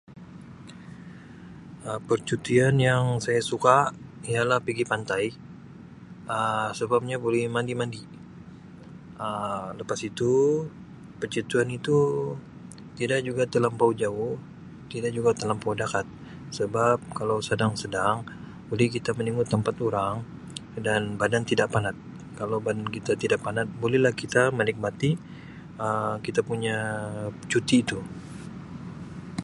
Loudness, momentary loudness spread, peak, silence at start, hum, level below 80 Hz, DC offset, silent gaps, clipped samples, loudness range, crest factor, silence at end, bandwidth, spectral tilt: -26 LUFS; 22 LU; -4 dBFS; 0.1 s; none; -56 dBFS; under 0.1%; none; under 0.1%; 5 LU; 24 dB; 0 s; 11.5 kHz; -5.5 dB/octave